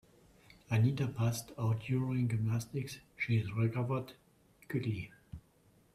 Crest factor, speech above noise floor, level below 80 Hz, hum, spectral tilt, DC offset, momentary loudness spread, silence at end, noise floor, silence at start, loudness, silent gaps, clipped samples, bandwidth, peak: 18 dB; 34 dB; -64 dBFS; none; -7 dB/octave; under 0.1%; 15 LU; 0.55 s; -67 dBFS; 0.7 s; -35 LUFS; none; under 0.1%; 14 kHz; -18 dBFS